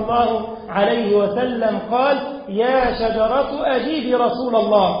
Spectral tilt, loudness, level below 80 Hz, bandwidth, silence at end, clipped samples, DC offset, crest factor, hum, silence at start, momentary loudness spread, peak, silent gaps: -10.5 dB/octave; -19 LUFS; -44 dBFS; 5.4 kHz; 0 s; under 0.1%; under 0.1%; 16 dB; none; 0 s; 5 LU; -2 dBFS; none